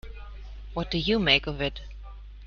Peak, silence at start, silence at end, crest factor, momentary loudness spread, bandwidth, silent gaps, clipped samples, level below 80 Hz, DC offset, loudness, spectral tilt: -6 dBFS; 0.05 s; 0 s; 24 dB; 23 LU; 7 kHz; none; under 0.1%; -40 dBFS; under 0.1%; -25 LUFS; -5.5 dB/octave